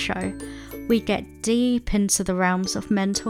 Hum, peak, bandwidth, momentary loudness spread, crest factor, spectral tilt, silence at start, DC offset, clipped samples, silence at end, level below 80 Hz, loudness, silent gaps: none; -8 dBFS; 16.5 kHz; 11 LU; 16 dB; -4 dB/octave; 0 s; under 0.1%; under 0.1%; 0 s; -40 dBFS; -23 LUFS; none